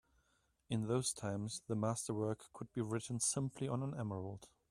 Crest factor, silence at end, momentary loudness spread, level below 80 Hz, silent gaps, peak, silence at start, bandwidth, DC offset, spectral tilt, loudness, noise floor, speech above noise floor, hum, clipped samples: 18 dB; 0.25 s; 10 LU; -72 dBFS; none; -22 dBFS; 0.7 s; 14 kHz; under 0.1%; -5 dB/octave; -40 LUFS; -78 dBFS; 38 dB; none; under 0.1%